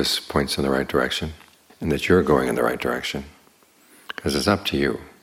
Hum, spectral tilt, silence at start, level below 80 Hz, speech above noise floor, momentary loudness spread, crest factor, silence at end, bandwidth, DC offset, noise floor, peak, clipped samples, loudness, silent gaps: none; -4.5 dB/octave; 0 s; -44 dBFS; 34 dB; 11 LU; 20 dB; 0.1 s; 17 kHz; under 0.1%; -56 dBFS; -4 dBFS; under 0.1%; -22 LUFS; none